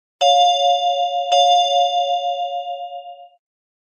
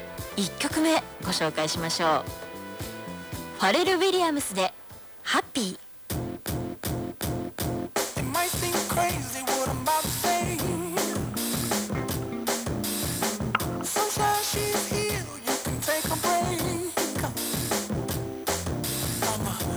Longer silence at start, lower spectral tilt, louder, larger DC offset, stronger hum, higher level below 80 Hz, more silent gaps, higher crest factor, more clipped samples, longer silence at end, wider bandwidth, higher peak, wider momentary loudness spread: first, 0.2 s vs 0 s; second, 5 dB/octave vs -3.5 dB/octave; first, -17 LUFS vs -27 LUFS; neither; neither; second, under -90 dBFS vs -46 dBFS; neither; second, 14 dB vs 22 dB; neither; first, 0.6 s vs 0 s; second, 9.8 kHz vs over 20 kHz; about the same, -4 dBFS vs -6 dBFS; first, 15 LU vs 9 LU